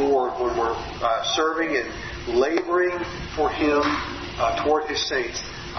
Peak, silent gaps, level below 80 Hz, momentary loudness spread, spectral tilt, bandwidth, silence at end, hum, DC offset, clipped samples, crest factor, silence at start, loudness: -10 dBFS; none; -44 dBFS; 8 LU; -4 dB/octave; 6.4 kHz; 0 s; none; under 0.1%; under 0.1%; 14 dB; 0 s; -24 LUFS